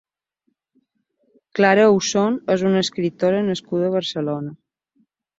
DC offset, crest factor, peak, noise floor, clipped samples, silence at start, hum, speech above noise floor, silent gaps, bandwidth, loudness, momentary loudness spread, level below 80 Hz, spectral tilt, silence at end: under 0.1%; 18 dB; -2 dBFS; -72 dBFS; under 0.1%; 1.55 s; none; 54 dB; none; 7.8 kHz; -19 LUFS; 11 LU; -64 dBFS; -5 dB/octave; 0.85 s